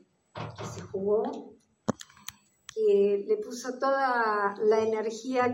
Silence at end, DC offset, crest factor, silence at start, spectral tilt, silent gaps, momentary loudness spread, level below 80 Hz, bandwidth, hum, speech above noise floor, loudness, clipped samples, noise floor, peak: 0 s; under 0.1%; 18 dB; 0.35 s; -5 dB/octave; none; 17 LU; -72 dBFS; 16 kHz; none; 21 dB; -28 LUFS; under 0.1%; -49 dBFS; -10 dBFS